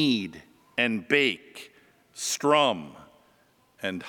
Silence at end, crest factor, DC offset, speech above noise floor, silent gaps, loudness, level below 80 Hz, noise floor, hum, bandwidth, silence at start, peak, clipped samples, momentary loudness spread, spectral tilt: 0 s; 22 dB; under 0.1%; 38 dB; none; -25 LUFS; -74 dBFS; -63 dBFS; none; 19 kHz; 0 s; -6 dBFS; under 0.1%; 23 LU; -3 dB/octave